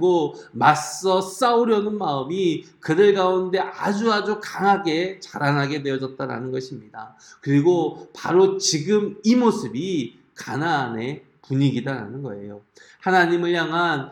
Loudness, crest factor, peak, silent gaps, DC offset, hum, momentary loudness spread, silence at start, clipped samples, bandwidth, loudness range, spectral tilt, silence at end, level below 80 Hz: -21 LUFS; 20 dB; -2 dBFS; none; under 0.1%; none; 14 LU; 0 s; under 0.1%; 17 kHz; 4 LU; -5 dB/octave; 0 s; -68 dBFS